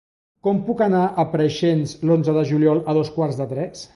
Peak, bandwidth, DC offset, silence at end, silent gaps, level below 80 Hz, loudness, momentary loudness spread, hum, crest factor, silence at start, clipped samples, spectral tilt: -6 dBFS; 11.5 kHz; under 0.1%; 0.1 s; none; -58 dBFS; -20 LUFS; 7 LU; none; 14 dB; 0.45 s; under 0.1%; -7.5 dB/octave